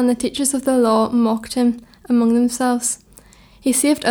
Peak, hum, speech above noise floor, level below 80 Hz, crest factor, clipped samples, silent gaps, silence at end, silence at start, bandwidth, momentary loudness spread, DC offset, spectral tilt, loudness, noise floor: -6 dBFS; none; 30 dB; -52 dBFS; 12 dB; under 0.1%; none; 0 s; 0 s; 18.5 kHz; 6 LU; under 0.1%; -3.5 dB/octave; -18 LUFS; -47 dBFS